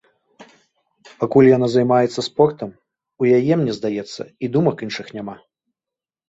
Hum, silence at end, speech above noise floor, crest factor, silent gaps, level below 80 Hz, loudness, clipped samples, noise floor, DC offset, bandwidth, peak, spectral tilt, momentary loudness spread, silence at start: none; 0.95 s; 71 dB; 18 dB; none; -60 dBFS; -18 LUFS; under 0.1%; -89 dBFS; under 0.1%; 8 kHz; -2 dBFS; -7 dB/octave; 19 LU; 0.4 s